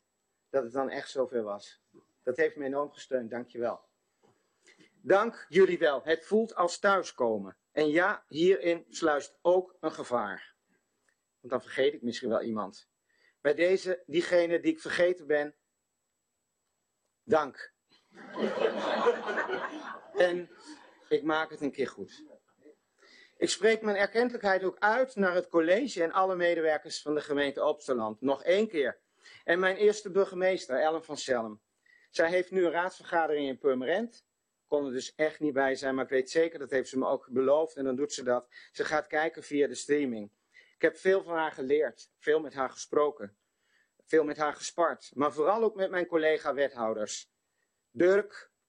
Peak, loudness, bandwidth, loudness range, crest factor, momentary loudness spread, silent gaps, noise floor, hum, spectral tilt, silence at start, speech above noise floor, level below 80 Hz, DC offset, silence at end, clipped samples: -10 dBFS; -30 LUFS; 10 kHz; 6 LU; 20 dB; 10 LU; none; -82 dBFS; none; -4 dB/octave; 0.55 s; 53 dB; -76 dBFS; under 0.1%; 0.25 s; under 0.1%